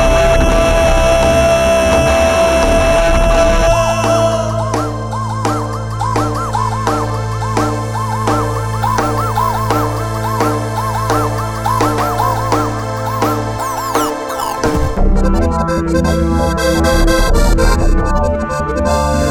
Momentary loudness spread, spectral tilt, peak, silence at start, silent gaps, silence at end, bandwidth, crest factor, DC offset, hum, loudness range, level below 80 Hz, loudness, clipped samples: 7 LU; -5.5 dB/octave; 0 dBFS; 0 s; none; 0 s; 19 kHz; 12 dB; under 0.1%; none; 5 LU; -18 dBFS; -14 LUFS; under 0.1%